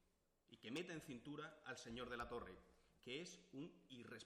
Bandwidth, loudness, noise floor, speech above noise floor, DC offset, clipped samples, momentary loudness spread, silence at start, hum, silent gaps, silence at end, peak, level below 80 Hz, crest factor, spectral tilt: 14 kHz; -54 LUFS; -81 dBFS; 28 dB; under 0.1%; under 0.1%; 10 LU; 0.5 s; none; none; 0 s; -38 dBFS; -74 dBFS; 18 dB; -4 dB/octave